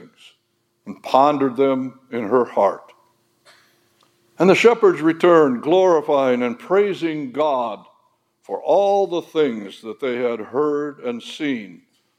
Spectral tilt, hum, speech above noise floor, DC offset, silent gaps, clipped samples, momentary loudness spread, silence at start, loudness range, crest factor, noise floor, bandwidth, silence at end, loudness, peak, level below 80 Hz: -6 dB/octave; none; 50 dB; under 0.1%; none; under 0.1%; 14 LU; 0 s; 6 LU; 20 dB; -68 dBFS; 12.5 kHz; 0.45 s; -19 LUFS; 0 dBFS; -80 dBFS